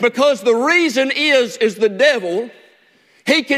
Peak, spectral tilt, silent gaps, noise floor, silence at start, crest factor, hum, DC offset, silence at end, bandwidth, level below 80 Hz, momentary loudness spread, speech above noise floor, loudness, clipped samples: 0 dBFS; -3 dB/octave; none; -54 dBFS; 0 s; 16 dB; none; under 0.1%; 0 s; 15.5 kHz; -66 dBFS; 10 LU; 38 dB; -15 LUFS; under 0.1%